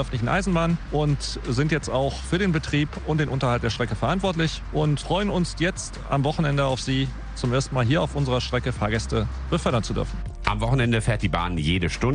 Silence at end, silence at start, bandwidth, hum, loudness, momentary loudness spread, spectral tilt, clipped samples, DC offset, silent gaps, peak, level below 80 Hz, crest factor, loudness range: 0 s; 0 s; 10 kHz; none; -24 LUFS; 4 LU; -6 dB/octave; under 0.1%; under 0.1%; none; -6 dBFS; -34 dBFS; 18 dB; 1 LU